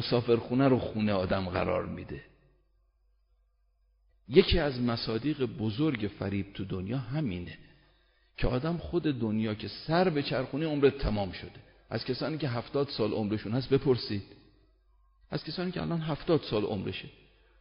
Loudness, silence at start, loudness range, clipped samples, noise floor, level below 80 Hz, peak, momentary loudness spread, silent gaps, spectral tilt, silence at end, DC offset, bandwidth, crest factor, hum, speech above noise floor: -31 LUFS; 0 s; 4 LU; under 0.1%; -70 dBFS; -46 dBFS; -6 dBFS; 12 LU; none; -5.5 dB/octave; 0.5 s; under 0.1%; 5.4 kHz; 26 dB; none; 40 dB